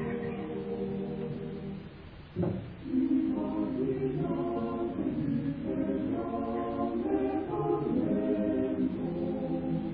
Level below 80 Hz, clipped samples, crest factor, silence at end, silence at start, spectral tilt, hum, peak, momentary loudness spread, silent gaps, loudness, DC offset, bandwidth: -54 dBFS; under 0.1%; 14 dB; 0 s; 0 s; -11.5 dB/octave; none; -18 dBFS; 8 LU; none; -32 LUFS; under 0.1%; 4.8 kHz